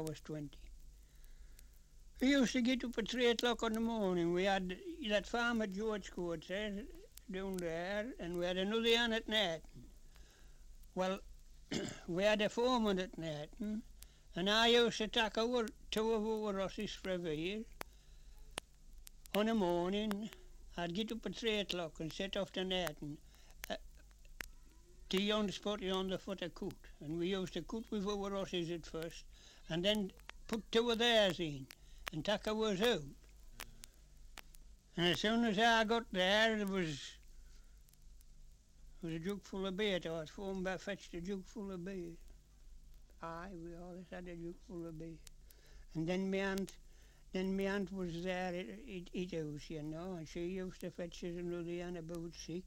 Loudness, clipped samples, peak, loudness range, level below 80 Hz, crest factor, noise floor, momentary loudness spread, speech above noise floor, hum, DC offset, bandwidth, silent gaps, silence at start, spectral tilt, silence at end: -38 LUFS; under 0.1%; -18 dBFS; 9 LU; -58 dBFS; 22 dB; -60 dBFS; 17 LU; 22 dB; none; under 0.1%; 16.5 kHz; none; 0 s; -4.5 dB/octave; 0 s